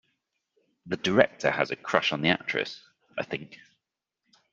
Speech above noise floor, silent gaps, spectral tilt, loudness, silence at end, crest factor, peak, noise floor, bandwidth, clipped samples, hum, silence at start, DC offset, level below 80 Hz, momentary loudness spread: 58 dB; none; -5 dB/octave; -27 LUFS; 0.95 s; 28 dB; -2 dBFS; -85 dBFS; 7.8 kHz; under 0.1%; none; 0.85 s; under 0.1%; -66 dBFS; 15 LU